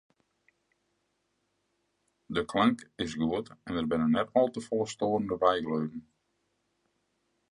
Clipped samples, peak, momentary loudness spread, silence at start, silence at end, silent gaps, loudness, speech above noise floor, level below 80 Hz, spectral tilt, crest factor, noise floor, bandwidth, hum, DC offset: under 0.1%; -10 dBFS; 10 LU; 2.3 s; 1.5 s; none; -30 LUFS; 48 dB; -60 dBFS; -6 dB/octave; 22 dB; -78 dBFS; 11 kHz; none; under 0.1%